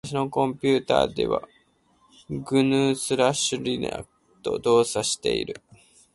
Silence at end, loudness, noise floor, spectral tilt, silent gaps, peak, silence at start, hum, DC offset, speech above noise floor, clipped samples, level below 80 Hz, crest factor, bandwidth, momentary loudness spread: 0.55 s; -24 LUFS; -63 dBFS; -4 dB/octave; none; -4 dBFS; 0.05 s; none; under 0.1%; 39 dB; under 0.1%; -54 dBFS; 20 dB; 11.5 kHz; 14 LU